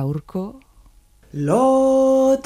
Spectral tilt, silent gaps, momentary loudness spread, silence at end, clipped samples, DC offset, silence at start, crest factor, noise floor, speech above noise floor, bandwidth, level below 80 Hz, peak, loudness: -7.5 dB/octave; none; 16 LU; 0.05 s; under 0.1%; under 0.1%; 0 s; 14 dB; -51 dBFS; 34 dB; 14 kHz; -50 dBFS; -6 dBFS; -17 LUFS